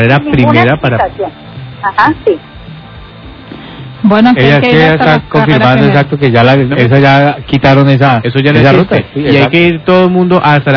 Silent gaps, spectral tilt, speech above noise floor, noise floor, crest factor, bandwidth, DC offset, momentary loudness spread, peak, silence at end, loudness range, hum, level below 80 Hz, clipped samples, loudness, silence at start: none; -8.5 dB/octave; 22 dB; -29 dBFS; 8 dB; 5.4 kHz; under 0.1%; 11 LU; 0 dBFS; 0 s; 6 LU; none; -36 dBFS; 5%; -7 LUFS; 0 s